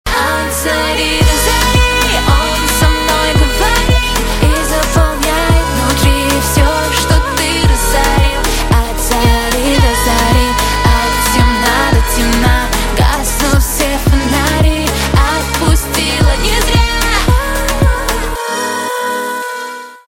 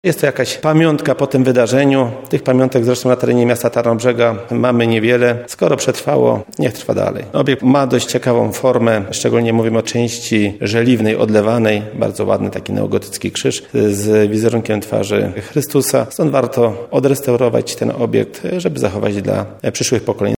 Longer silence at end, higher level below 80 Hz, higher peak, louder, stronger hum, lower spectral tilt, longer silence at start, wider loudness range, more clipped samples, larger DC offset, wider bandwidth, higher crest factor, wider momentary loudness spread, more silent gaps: about the same, 0.1 s vs 0.05 s; first, -16 dBFS vs -54 dBFS; about the same, 0 dBFS vs 0 dBFS; first, -12 LUFS vs -15 LUFS; neither; second, -4 dB/octave vs -5.5 dB/octave; about the same, 0.05 s vs 0.05 s; about the same, 1 LU vs 2 LU; neither; neither; about the same, 17 kHz vs 18.5 kHz; about the same, 12 dB vs 14 dB; about the same, 4 LU vs 6 LU; neither